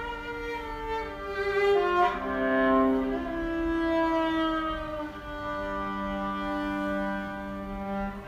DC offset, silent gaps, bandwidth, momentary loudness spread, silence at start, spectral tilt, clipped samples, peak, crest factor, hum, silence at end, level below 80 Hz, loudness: under 0.1%; none; 15.5 kHz; 11 LU; 0 s; -6.5 dB/octave; under 0.1%; -14 dBFS; 14 dB; none; 0 s; -46 dBFS; -29 LUFS